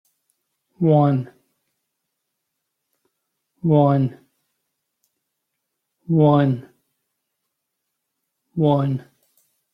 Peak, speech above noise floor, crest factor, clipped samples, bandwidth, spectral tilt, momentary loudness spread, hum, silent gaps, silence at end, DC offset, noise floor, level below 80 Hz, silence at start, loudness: -4 dBFS; 61 dB; 20 dB; under 0.1%; 5 kHz; -10.5 dB/octave; 13 LU; none; none; 0.75 s; under 0.1%; -78 dBFS; -62 dBFS; 0.8 s; -19 LUFS